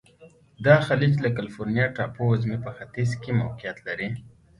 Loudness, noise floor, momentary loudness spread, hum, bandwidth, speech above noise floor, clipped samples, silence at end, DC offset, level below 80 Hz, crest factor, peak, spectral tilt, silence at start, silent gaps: -25 LUFS; -53 dBFS; 14 LU; none; 11.5 kHz; 29 dB; under 0.1%; 0.3 s; under 0.1%; -54 dBFS; 22 dB; -2 dBFS; -7.5 dB/octave; 0.2 s; none